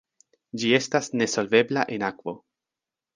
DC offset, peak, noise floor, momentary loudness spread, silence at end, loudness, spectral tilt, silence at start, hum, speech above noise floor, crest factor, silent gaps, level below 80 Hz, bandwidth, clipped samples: under 0.1%; -6 dBFS; -89 dBFS; 16 LU; 0.8 s; -24 LUFS; -4 dB/octave; 0.55 s; none; 65 dB; 20 dB; none; -70 dBFS; 10 kHz; under 0.1%